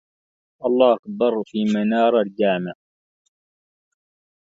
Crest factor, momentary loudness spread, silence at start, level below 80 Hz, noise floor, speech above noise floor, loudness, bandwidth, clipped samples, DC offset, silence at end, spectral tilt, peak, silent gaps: 20 dB; 8 LU; 0.6 s; -70 dBFS; under -90 dBFS; over 71 dB; -20 LUFS; 7.6 kHz; under 0.1%; under 0.1%; 1.7 s; -7 dB/octave; -2 dBFS; 0.99-1.03 s